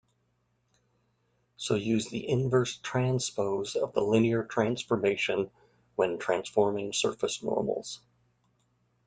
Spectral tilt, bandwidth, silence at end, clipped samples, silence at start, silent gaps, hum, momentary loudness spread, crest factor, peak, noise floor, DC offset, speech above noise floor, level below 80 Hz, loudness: -5 dB/octave; 9.4 kHz; 1.1 s; under 0.1%; 1.6 s; none; 60 Hz at -55 dBFS; 7 LU; 20 dB; -10 dBFS; -74 dBFS; under 0.1%; 45 dB; -66 dBFS; -29 LUFS